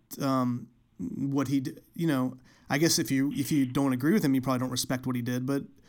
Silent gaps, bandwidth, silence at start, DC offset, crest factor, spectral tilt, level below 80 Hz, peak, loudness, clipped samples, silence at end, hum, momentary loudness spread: none; 19 kHz; 0.1 s; under 0.1%; 16 dB; -5 dB/octave; -64 dBFS; -12 dBFS; -28 LUFS; under 0.1%; 0.2 s; none; 9 LU